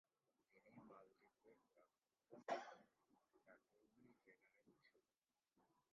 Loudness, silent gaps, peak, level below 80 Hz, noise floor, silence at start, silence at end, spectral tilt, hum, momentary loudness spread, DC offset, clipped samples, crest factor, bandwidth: -53 LUFS; none; -34 dBFS; under -90 dBFS; under -90 dBFS; 0.55 s; 0.3 s; -2.5 dB/octave; none; 18 LU; under 0.1%; under 0.1%; 28 dB; 6.6 kHz